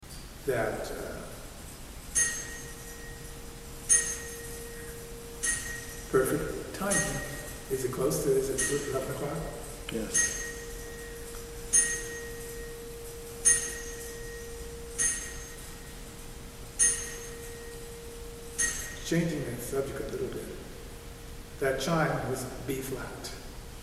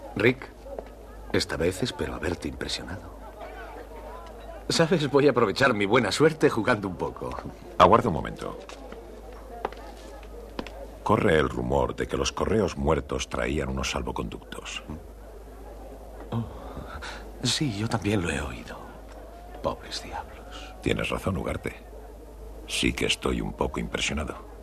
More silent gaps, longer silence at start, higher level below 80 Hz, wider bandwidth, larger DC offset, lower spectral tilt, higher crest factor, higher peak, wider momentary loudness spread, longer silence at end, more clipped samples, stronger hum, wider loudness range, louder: neither; about the same, 0 s vs 0 s; about the same, -46 dBFS vs -42 dBFS; first, 16 kHz vs 14 kHz; neither; second, -3 dB/octave vs -5 dB/octave; about the same, 24 dB vs 24 dB; second, -10 dBFS vs -4 dBFS; second, 19 LU vs 22 LU; about the same, 0 s vs 0 s; neither; neither; second, 5 LU vs 9 LU; second, -30 LUFS vs -27 LUFS